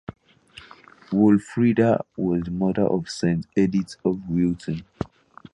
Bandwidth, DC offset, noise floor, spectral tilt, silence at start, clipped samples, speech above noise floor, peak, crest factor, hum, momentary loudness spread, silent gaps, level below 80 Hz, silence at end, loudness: 11 kHz; under 0.1%; -49 dBFS; -7.5 dB/octave; 0.1 s; under 0.1%; 27 dB; -6 dBFS; 16 dB; none; 13 LU; none; -50 dBFS; 0.5 s; -23 LUFS